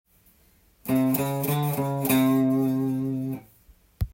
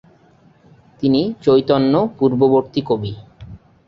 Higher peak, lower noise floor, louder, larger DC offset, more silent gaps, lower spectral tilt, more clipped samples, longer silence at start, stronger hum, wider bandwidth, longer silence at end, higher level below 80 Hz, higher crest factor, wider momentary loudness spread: second, -10 dBFS vs -2 dBFS; first, -60 dBFS vs -51 dBFS; second, -25 LUFS vs -16 LUFS; neither; neither; second, -6.5 dB/octave vs -9 dB/octave; neither; second, 0.85 s vs 1 s; neither; first, 17 kHz vs 5.8 kHz; second, 0.05 s vs 0.3 s; about the same, -46 dBFS vs -50 dBFS; about the same, 16 dB vs 16 dB; first, 13 LU vs 8 LU